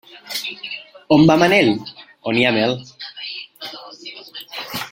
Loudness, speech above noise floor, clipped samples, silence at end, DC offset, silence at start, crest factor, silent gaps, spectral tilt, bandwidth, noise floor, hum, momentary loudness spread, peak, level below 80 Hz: -17 LUFS; 23 dB; under 0.1%; 0.05 s; under 0.1%; 0.15 s; 18 dB; none; -5.5 dB/octave; 16.5 kHz; -37 dBFS; none; 21 LU; -2 dBFS; -54 dBFS